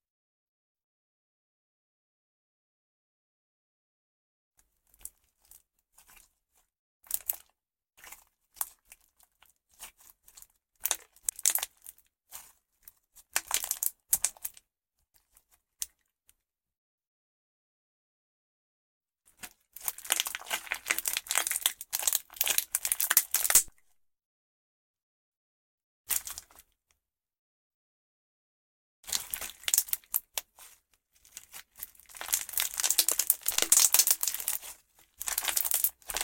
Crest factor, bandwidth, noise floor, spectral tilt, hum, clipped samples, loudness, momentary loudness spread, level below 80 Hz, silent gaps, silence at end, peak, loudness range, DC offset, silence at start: 30 dB; 17 kHz; -81 dBFS; 3 dB/octave; none; under 0.1%; -28 LUFS; 25 LU; -68 dBFS; 6.79-7.00 s, 16.78-16.98 s, 17.07-19.01 s, 24.25-24.94 s, 25.03-25.78 s, 25.84-26.04 s, 27.39-29.03 s; 0 s; -6 dBFS; 17 LU; under 0.1%; 5.05 s